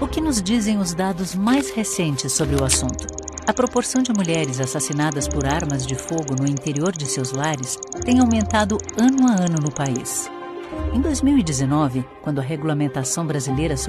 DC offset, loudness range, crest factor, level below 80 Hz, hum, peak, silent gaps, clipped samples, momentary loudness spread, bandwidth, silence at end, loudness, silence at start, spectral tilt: under 0.1%; 2 LU; 18 dB; -36 dBFS; none; -2 dBFS; none; under 0.1%; 8 LU; 13.5 kHz; 0 s; -21 LUFS; 0 s; -4.5 dB/octave